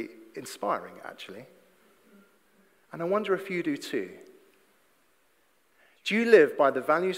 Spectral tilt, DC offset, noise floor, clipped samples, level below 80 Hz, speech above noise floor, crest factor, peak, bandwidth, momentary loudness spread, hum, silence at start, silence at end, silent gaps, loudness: -5 dB/octave; under 0.1%; -68 dBFS; under 0.1%; -86 dBFS; 42 dB; 24 dB; -6 dBFS; 16 kHz; 23 LU; none; 0 s; 0 s; none; -26 LUFS